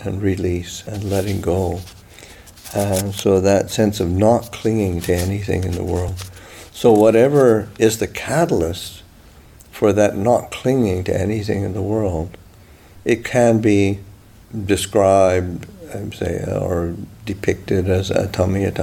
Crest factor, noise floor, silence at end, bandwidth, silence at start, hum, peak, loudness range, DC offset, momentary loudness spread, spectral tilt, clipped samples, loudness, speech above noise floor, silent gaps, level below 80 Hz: 16 dB; -45 dBFS; 0 s; 18 kHz; 0 s; none; -2 dBFS; 4 LU; under 0.1%; 15 LU; -6 dB/octave; under 0.1%; -18 LUFS; 27 dB; none; -42 dBFS